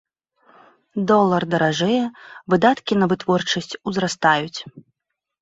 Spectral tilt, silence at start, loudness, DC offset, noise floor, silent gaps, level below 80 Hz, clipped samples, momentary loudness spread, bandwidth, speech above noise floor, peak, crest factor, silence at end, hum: -5 dB/octave; 0.95 s; -19 LUFS; under 0.1%; -81 dBFS; none; -60 dBFS; under 0.1%; 14 LU; 8 kHz; 62 dB; -2 dBFS; 20 dB; 0.6 s; none